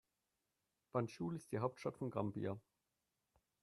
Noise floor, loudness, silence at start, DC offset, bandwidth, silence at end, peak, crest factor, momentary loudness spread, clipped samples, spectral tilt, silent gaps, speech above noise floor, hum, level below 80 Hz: -89 dBFS; -44 LUFS; 0.95 s; under 0.1%; 13 kHz; 1 s; -24 dBFS; 22 dB; 4 LU; under 0.1%; -7.5 dB/octave; none; 46 dB; none; -80 dBFS